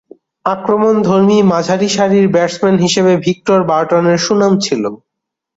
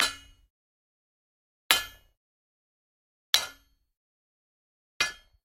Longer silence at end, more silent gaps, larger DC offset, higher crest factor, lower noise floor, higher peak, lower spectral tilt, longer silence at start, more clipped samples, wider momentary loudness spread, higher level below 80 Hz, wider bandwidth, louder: first, 0.6 s vs 0.3 s; second, none vs 0.50-1.69 s, 2.17-3.33 s, 3.97-5.00 s; neither; second, 12 dB vs 34 dB; first, -78 dBFS vs -54 dBFS; about the same, -2 dBFS vs 0 dBFS; first, -5.5 dB/octave vs 1.5 dB/octave; first, 0.45 s vs 0 s; neither; second, 7 LU vs 16 LU; first, -52 dBFS vs -64 dBFS; second, 8 kHz vs 16 kHz; first, -12 LUFS vs -27 LUFS